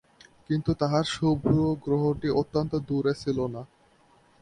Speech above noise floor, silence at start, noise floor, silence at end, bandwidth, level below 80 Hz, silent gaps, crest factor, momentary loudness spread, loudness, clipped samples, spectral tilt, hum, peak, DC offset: 35 dB; 0.5 s; -61 dBFS; 0.75 s; 10.5 kHz; -50 dBFS; none; 18 dB; 6 LU; -27 LUFS; under 0.1%; -7 dB/octave; none; -10 dBFS; under 0.1%